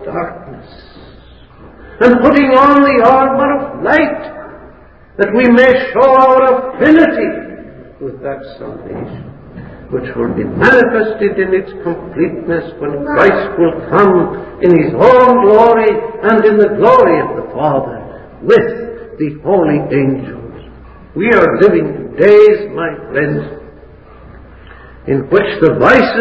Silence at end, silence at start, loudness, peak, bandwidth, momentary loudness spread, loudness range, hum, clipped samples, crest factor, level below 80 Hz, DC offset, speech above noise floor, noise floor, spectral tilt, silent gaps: 0 s; 0 s; -10 LUFS; 0 dBFS; 8 kHz; 19 LU; 6 LU; none; 0.7%; 12 dB; -40 dBFS; 0.3%; 29 dB; -40 dBFS; -8 dB/octave; none